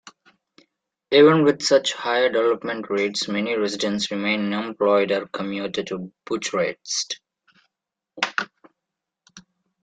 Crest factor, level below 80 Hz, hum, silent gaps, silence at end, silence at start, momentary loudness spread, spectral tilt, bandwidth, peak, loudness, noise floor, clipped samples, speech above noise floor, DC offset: 20 dB; -68 dBFS; none; none; 0.45 s; 0.05 s; 12 LU; -4 dB/octave; 9.4 kHz; -4 dBFS; -22 LUFS; -85 dBFS; under 0.1%; 64 dB; under 0.1%